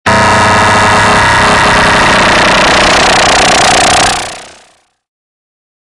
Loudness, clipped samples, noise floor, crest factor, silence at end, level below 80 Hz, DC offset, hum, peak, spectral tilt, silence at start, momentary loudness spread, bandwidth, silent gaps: -6 LUFS; under 0.1%; -46 dBFS; 8 dB; 1.5 s; -28 dBFS; under 0.1%; none; 0 dBFS; -2.5 dB/octave; 0.05 s; 1 LU; 11.5 kHz; none